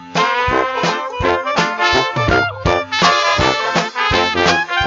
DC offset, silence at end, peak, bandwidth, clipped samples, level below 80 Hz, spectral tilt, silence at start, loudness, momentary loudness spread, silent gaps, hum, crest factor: under 0.1%; 0 s; 0 dBFS; 8 kHz; under 0.1%; -36 dBFS; -3.5 dB/octave; 0 s; -15 LUFS; 4 LU; none; none; 14 dB